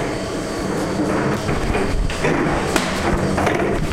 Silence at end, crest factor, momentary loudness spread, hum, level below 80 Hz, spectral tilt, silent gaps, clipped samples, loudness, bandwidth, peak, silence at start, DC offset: 0 s; 16 dB; 5 LU; none; -28 dBFS; -5.5 dB/octave; none; under 0.1%; -20 LUFS; 16.5 kHz; -4 dBFS; 0 s; under 0.1%